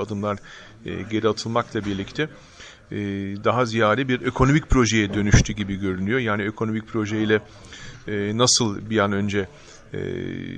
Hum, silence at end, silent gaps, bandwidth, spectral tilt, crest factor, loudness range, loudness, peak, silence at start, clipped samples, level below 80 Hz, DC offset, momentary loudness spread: none; 0 s; none; 10 kHz; -4.5 dB/octave; 18 dB; 5 LU; -22 LUFS; -4 dBFS; 0 s; under 0.1%; -36 dBFS; under 0.1%; 16 LU